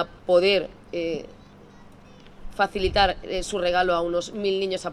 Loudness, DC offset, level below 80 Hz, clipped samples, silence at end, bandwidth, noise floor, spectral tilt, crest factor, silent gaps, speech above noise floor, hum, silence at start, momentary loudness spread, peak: -24 LUFS; under 0.1%; -42 dBFS; under 0.1%; 0 s; 12 kHz; -48 dBFS; -4 dB/octave; 18 dB; none; 24 dB; 50 Hz at -55 dBFS; 0 s; 11 LU; -6 dBFS